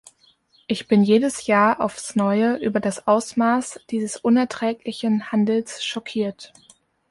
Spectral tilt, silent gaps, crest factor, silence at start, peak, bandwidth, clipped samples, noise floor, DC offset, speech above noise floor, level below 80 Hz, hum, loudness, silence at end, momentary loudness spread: -5 dB/octave; none; 16 dB; 0.7 s; -4 dBFS; 11.5 kHz; under 0.1%; -59 dBFS; under 0.1%; 38 dB; -64 dBFS; none; -21 LUFS; 0.65 s; 10 LU